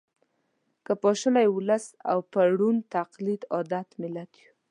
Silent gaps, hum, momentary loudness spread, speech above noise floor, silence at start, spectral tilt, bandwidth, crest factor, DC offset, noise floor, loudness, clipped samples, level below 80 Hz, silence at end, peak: none; none; 12 LU; 49 dB; 0.9 s; -6 dB/octave; 11 kHz; 16 dB; under 0.1%; -74 dBFS; -26 LUFS; under 0.1%; -82 dBFS; 0.45 s; -10 dBFS